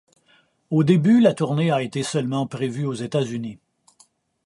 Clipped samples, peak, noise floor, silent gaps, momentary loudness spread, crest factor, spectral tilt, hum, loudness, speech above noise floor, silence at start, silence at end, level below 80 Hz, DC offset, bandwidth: under 0.1%; -4 dBFS; -60 dBFS; none; 11 LU; 18 dB; -7 dB/octave; none; -21 LUFS; 40 dB; 0.7 s; 0.9 s; -64 dBFS; under 0.1%; 11.5 kHz